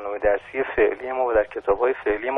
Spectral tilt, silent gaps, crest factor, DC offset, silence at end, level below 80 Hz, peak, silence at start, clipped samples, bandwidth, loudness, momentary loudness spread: -7.5 dB/octave; none; 16 dB; under 0.1%; 0 s; -46 dBFS; -6 dBFS; 0 s; under 0.1%; 3.9 kHz; -23 LUFS; 4 LU